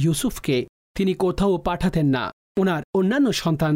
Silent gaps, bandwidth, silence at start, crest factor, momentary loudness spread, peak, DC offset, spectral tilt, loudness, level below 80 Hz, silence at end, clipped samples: 0.69-0.95 s, 2.33-2.55 s, 2.84-2.93 s; 16 kHz; 0 s; 10 dB; 5 LU; -12 dBFS; under 0.1%; -6 dB/octave; -22 LUFS; -42 dBFS; 0 s; under 0.1%